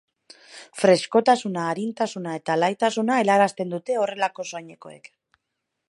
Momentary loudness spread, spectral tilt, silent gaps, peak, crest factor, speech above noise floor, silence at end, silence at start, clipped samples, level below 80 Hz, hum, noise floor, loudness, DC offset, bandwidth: 17 LU; -4.5 dB/octave; none; -4 dBFS; 20 dB; 58 dB; 0.9 s; 0.5 s; under 0.1%; -78 dBFS; none; -80 dBFS; -22 LUFS; under 0.1%; 11.5 kHz